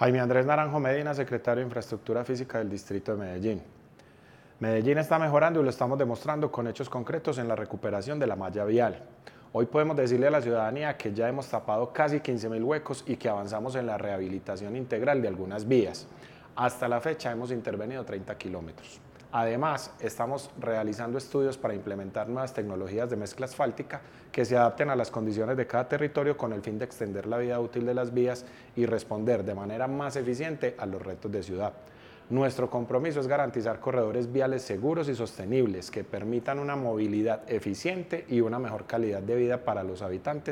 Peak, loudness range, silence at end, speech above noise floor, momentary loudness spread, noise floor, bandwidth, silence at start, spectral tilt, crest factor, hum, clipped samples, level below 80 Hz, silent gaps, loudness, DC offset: -6 dBFS; 5 LU; 0 s; 26 dB; 10 LU; -55 dBFS; 16 kHz; 0 s; -7 dB/octave; 24 dB; none; under 0.1%; -64 dBFS; none; -30 LUFS; under 0.1%